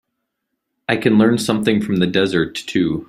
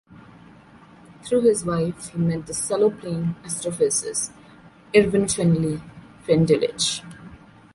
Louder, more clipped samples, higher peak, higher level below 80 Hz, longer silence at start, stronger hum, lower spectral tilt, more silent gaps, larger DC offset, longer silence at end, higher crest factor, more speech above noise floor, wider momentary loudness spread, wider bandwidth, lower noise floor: first, -17 LUFS vs -22 LUFS; neither; about the same, -2 dBFS vs -4 dBFS; about the same, -52 dBFS vs -52 dBFS; first, 0.9 s vs 0.1 s; neither; about the same, -5.5 dB/octave vs -5 dB/octave; neither; neither; second, 0.05 s vs 0.4 s; about the same, 16 dB vs 20 dB; first, 59 dB vs 27 dB; second, 7 LU vs 13 LU; first, 13.5 kHz vs 11.5 kHz; first, -76 dBFS vs -48 dBFS